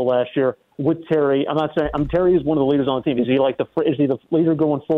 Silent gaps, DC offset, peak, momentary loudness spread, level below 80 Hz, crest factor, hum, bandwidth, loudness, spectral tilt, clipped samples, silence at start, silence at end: none; under 0.1%; -8 dBFS; 4 LU; -44 dBFS; 12 dB; none; 4.4 kHz; -19 LUFS; -9.5 dB/octave; under 0.1%; 0 s; 0 s